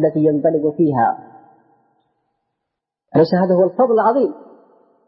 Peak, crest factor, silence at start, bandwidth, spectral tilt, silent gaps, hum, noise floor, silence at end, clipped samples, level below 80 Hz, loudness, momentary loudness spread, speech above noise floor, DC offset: -4 dBFS; 14 dB; 0 s; 5.8 kHz; -13 dB/octave; none; none; -80 dBFS; 0.7 s; under 0.1%; -66 dBFS; -16 LUFS; 5 LU; 65 dB; under 0.1%